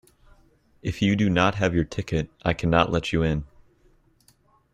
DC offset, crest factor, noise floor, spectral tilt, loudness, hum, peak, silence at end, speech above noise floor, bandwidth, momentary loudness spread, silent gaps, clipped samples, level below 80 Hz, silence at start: under 0.1%; 22 dB; -61 dBFS; -6.5 dB/octave; -24 LUFS; none; -2 dBFS; 1.3 s; 38 dB; 11 kHz; 8 LU; none; under 0.1%; -44 dBFS; 0.85 s